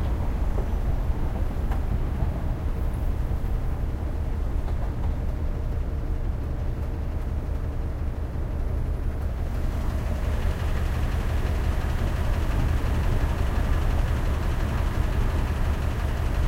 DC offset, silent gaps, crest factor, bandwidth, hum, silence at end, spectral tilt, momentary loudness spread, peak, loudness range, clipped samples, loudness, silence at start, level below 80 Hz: under 0.1%; none; 14 dB; 16 kHz; none; 0 s; -7 dB/octave; 4 LU; -12 dBFS; 4 LU; under 0.1%; -29 LUFS; 0 s; -26 dBFS